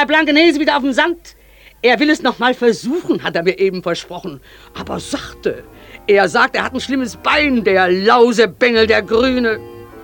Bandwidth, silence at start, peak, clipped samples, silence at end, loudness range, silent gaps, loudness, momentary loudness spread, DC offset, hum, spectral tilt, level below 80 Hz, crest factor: 18 kHz; 0 s; 0 dBFS; under 0.1%; 0 s; 6 LU; none; -14 LUFS; 15 LU; under 0.1%; none; -4.5 dB/octave; -44 dBFS; 16 dB